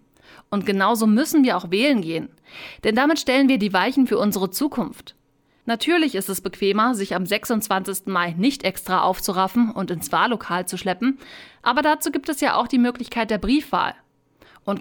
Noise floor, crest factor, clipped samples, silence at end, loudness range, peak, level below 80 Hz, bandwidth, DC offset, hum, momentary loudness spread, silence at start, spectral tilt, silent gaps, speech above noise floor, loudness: -62 dBFS; 16 dB; under 0.1%; 0 s; 3 LU; -6 dBFS; -50 dBFS; over 20 kHz; under 0.1%; none; 9 LU; 0.5 s; -4.5 dB/octave; none; 41 dB; -21 LUFS